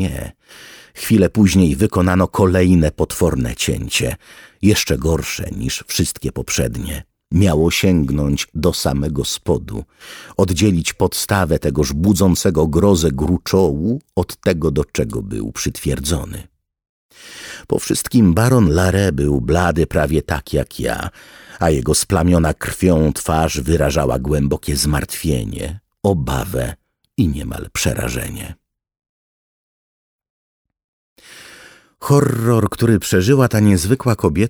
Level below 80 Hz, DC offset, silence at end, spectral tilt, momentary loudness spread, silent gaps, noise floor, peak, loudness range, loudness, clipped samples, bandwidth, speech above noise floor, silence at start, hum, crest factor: -30 dBFS; under 0.1%; 0 s; -5.5 dB/octave; 12 LU; 16.89-17.09 s, 29.09-30.19 s, 30.30-30.65 s, 30.84-31.16 s; -44 dBFS; -2 dBFS; 7 LU; -17 LUFS; under 0.1%; over 20 kHz; 28 dB; 0 s; none; 16 dB